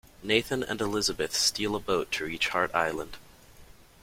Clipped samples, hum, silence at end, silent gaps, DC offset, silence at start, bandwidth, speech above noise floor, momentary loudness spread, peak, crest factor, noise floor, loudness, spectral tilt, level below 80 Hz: under 0.1%; none; 0.2 s; none; under 0.1%; 0.05 s; 16.5 kHz; 24 dB; 7 LU; -8 dBFS; 22 dB; -52 dBFS; -28 LUFS; -2.5 dB/octave; -54 dBFS